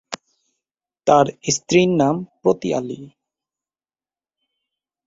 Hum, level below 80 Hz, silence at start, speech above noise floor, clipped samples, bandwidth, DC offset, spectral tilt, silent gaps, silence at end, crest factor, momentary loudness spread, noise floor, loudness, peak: none; -58 dBFS; 0.1 s; over 72 dB; under 0.1%; 8 kHz; under 0.1%; -5 dB/octave; none; 2 s; 20 dB; 18 LU; under -90 dBFS; -18 LUFS; -2 dBFS